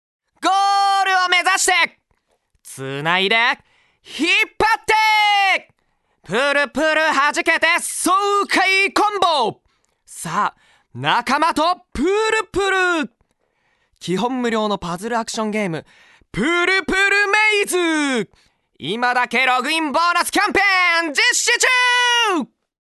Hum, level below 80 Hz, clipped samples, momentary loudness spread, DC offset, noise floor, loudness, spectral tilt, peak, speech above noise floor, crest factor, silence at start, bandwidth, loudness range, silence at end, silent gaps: none; -50 dBFS; under 0.1%; 10 LU; under 0.1%; -66 dBFS; -17 LUFS; -2 dB/octave; 0 dBFS; 48 dB; 18 dB; 0.4 s; 12.5 kHz; 5 LU; 0.4 s; none